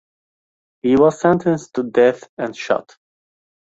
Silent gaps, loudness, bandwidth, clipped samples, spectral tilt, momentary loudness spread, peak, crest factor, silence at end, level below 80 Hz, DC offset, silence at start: 2.29-2.37 s; -18 LUFS; 8 kHz; under 0.1%; -6.5 dB/octave; 12 LU; -2 dBFS; 18 dB; 0.95 s; -56 dBFS; under 0.1%; 0.85 s